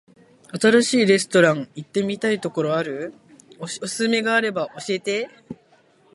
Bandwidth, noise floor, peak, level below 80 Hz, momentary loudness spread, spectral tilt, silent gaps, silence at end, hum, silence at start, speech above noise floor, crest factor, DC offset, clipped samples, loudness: 11.5 kHz; -57 dBFS; -2 dBFS; -68 dBFS; 18 LU; -4 dB/octave; none; 0.6 s; none; 0.55 s; 36 dB; 20 dB; under 0.1%; under 0.1%; -21 LUFS